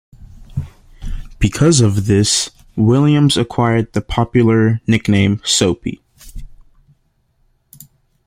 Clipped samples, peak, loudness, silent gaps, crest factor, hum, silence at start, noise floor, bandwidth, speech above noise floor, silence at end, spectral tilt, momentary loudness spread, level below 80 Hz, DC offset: under 0.1%; 0 dBFS; -14 LUFS; none; 16 dB; none; 0.35 s; -60 dBFS; 15.5 kHz; 47 dB; 1.8 s; -5 dB/octave; 18 LU; -34 dBFS; under 0.1%